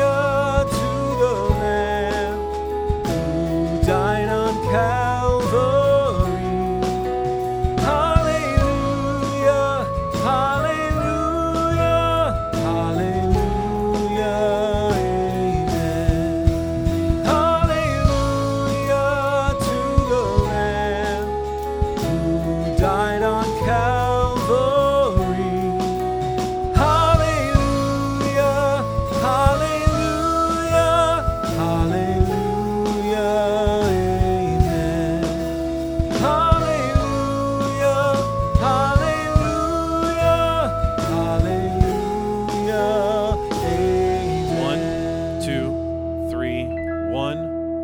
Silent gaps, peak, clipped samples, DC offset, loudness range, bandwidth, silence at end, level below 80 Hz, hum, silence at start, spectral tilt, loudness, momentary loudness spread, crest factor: none; 0 dBFS; under 0.1%; under 0.1%; 2 LU; over 20 kHz; 0 s; -30 dBFS; none; 0 s; -6.5 dB/octave; -20 LUFS; 6 LU; 20 dB